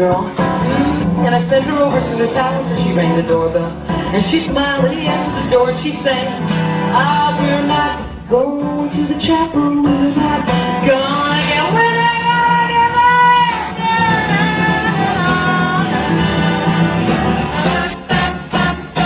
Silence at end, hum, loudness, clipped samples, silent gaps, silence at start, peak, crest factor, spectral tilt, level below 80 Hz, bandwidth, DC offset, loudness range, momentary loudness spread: 0 s; none; -14 LUFS; under 0.1%; none; 0 s; 0 dBFS; 14 dB; -10 dB/octave; -36 dBFS; 4 kHz; under 0.1%; 3 LU; 5 LU